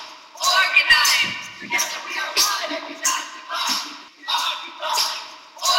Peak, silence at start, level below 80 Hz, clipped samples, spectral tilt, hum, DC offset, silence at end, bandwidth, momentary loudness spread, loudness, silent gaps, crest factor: -2 dBFS; 0 s; -60 dBFS; under 0.1%; 1.5 dB/octave; none; under 0.1%; 0 s; 16 kHz; 17 LU; -19 LUFS; none; 20 dB